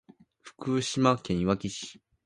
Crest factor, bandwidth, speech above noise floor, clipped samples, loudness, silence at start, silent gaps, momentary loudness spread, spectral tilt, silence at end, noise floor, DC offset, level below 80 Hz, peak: 22 dB; 11.5 kHz; 27 dB; under 0.1%; -28 LUFS; 0.45 s; none; 14 LU; -5.5 dB/octave; 0.35 s; -55 dBFS; under 0.1%; -54 dBFS; -8 dBFS